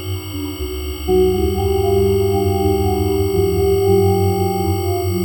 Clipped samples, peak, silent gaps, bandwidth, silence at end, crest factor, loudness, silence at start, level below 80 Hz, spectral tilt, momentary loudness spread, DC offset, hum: under 0.1%; -2 dBFS; none; 19 kHz; 0 s; 14 dB; -17 LUFS; 0 s; -28 dBFS; -6.5 dB/octave; 10 LU; under 0.1%; none